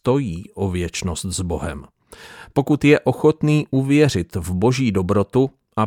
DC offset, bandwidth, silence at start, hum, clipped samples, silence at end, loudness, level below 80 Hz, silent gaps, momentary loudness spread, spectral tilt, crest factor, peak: under 0.1%; 16 kHz; 0.05 s; none; under 0.1%; 0 s; -19 LUFS; -42 dBFS; none; 10 LU; -6.5 dB/octave; 18 dB; -2 dBFS